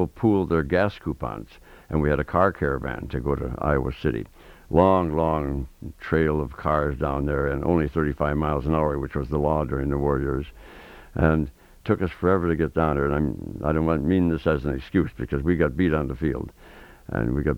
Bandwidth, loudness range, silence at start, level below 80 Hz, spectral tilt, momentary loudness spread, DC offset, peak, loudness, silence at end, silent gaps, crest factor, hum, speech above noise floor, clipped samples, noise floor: 16 kHz; 2 LU; 0 s; -36 dBFS; -9 dB/octave; 10 LU; under 0.1%; -4 dBFS; -24 LUFS; 0 s; none; 20 dB; none; 24 dB; under 0.1%; -47 dBFS